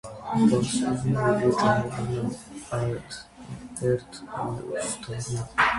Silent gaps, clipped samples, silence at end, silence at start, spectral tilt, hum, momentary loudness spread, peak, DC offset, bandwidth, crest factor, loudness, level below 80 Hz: none; under 0.1%; 0 s; 0.05 s; -5.5 dB/octave; none; 16 LU; -8 dBFS; under 0.1%; 11.5 kHz; 18 dB; -26 LUFS; -52 dBFS